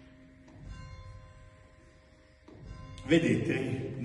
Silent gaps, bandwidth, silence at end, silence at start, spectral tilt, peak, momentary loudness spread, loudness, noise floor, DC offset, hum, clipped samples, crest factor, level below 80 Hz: none; 11.5 kHz; 0 s; 0 s; -6.5 dB/octave; -12 dBFS; 26 LU; -29 LUFS; -59 dBFS; under 0.1%; none; under 0.1%; 22 dB; -54 dBFS